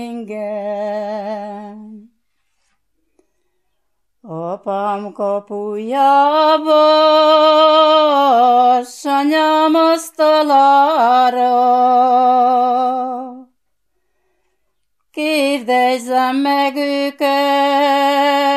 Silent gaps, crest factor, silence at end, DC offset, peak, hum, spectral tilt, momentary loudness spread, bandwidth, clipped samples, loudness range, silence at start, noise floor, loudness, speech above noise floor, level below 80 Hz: none; 14 dB; 0 s; under 0.1%; -2 dBFS; none; -3.5 dB/octave; 14 LU; 13.5 kHz; under 0.1%; 16 LU; 0 s; -73 dBFS; -13 LUFS; 59 dB; -76 dBFS